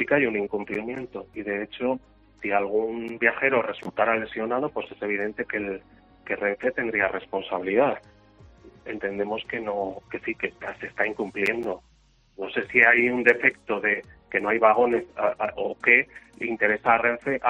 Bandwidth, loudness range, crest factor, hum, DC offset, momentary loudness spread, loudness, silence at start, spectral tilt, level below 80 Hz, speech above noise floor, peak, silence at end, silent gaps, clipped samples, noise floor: 9.8 kHz; 8 LU; 24 dB; none; under 0.1%; 14 LU; -24 LUFS; 0 s; -6.5 dB/octave; -60 dBFS; 35 dB; -2 dBFS; 0 s; none; under 0.1%; -60 dBFS